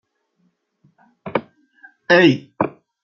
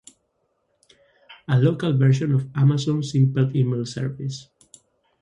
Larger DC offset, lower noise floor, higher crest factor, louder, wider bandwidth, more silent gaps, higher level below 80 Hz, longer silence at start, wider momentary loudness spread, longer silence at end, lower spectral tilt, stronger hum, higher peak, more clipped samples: neither; second, -66 dBFS vs -71 dBFS; about the same, 20 dB vs 16 dB; first, -18 LUFS vs -21 LUFS; second, 7 kHz vs 10.5 kHz; neither; about the same, -64 dBFS vs -60 dBFS; about the same, 1.25 s vs 1.3 s; first, 21 LU vs 12 LU; second, 0.35 s vs 0.8 s; about the same, -6.5 dB/octave vs -7.5 dB/octave; neither; first, -2 dBFS vs -6 dBFS; neither